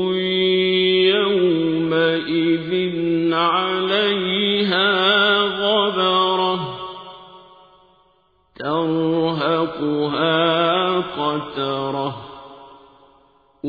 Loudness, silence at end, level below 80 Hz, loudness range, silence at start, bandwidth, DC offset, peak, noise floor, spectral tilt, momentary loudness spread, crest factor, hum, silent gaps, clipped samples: -18 LUFS; 0 s; -58 dBFS; 6 LU; 0 s; 5 kHz; under 0.1%; -4 dBFS; -60 dBFS; -7.5 dB/octave; 9 LU; 16 dB; none; none; under 0.1%